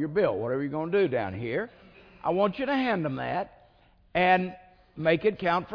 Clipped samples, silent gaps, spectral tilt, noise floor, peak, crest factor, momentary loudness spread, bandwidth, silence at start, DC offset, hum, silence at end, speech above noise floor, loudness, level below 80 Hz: under 0.1%; none; -8.5 dB/octave; -60 dBFS; -8 dBFS; 18 dB; 9 LU; 5.4 kHz; 0 s; under 0.1%; none; 0 s; 33 dB; -27 LUFS; -60 dBFS